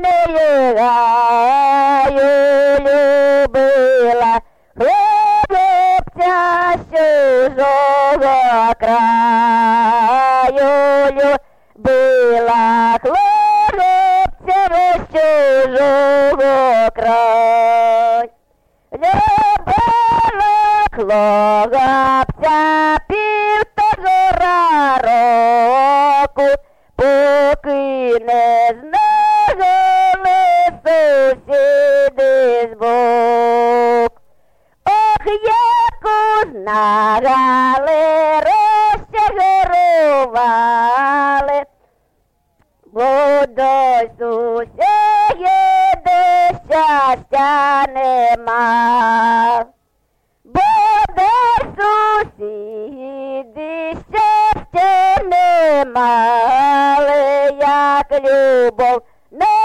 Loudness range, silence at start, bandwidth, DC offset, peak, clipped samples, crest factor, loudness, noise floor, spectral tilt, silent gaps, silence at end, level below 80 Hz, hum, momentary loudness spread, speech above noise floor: 3 LU; 0 s; 13 kHz; under 0.1%; -8 dBFS; under 0.1%; 4 dB; -13 LUFS; -63 dBFS; -5 dB/octave; none; 0 s; -40 dBFS; none; 5 LU; 51 dB